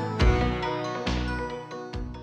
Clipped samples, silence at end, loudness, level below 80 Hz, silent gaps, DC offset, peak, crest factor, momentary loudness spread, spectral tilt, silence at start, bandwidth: under 0.1%; 0 s; -28 LUFS; -32 dBFS; none; under 0.1%; -10 dBFS; 16 dB; 13 LU; -6.5 dB/octave; 0 s; 8.8 kHz